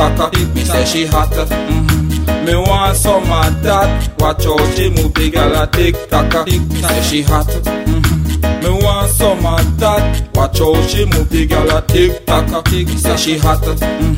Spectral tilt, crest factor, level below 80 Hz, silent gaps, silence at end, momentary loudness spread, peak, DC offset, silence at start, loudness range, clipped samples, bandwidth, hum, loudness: -5 dB/octave; 12 dB; -18 dBFS; none; 0 s; 3 LU; 0 dBFS; 0.2%; 0 s; 1 LU; under 0.1%; 16.5 kHz; none; -13 LUFS